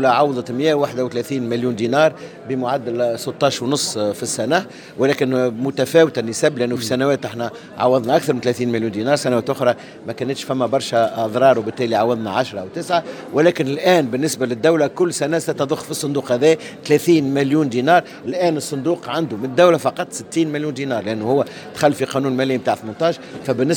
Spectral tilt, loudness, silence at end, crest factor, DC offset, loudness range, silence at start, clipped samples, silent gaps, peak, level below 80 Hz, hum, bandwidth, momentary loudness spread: -5 dB/octave; -19 LUFS; 0 s; 18 dB; under 0.1%; 2 LU; 0 s; under 0.1%; none; 0 dBFS; -64 dBFS; none; 19.5 kHz; 8 LU